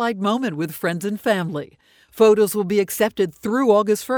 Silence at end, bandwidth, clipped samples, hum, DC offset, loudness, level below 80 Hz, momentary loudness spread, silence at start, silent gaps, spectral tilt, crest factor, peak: 0 s; over 20 kHz; under 0.1%; none; under 0.1%; -20 LUFS; -62 dBFS; 9 LU; 0 s; none; -5 dB/octave; 16 dB; -4 dBFS